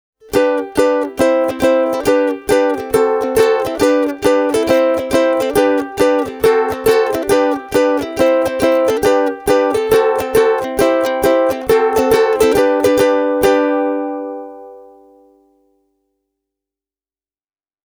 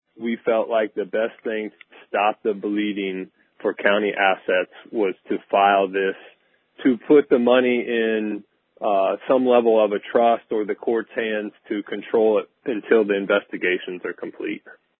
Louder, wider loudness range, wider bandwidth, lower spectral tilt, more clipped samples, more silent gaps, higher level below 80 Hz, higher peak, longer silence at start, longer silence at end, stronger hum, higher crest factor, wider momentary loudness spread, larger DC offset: first, -14 LUFS vs -21 LUFS; about the same, 4 LU vs 4 LU; first, over 20 kHz vs 4 kHz; second, -4.5 dB/octave vs -10 dB/octave; neither; neither; first, -44 dBFS vs -74 dBFS; about the same, 0 dBFS vs -2 dBFS; about the same, 0.3 s vs 0.2 s; first, 3.05 s vs 0.3 s; neither; second, 14 dB vs 20 dB; second, 3 LU vs 13 LU; neither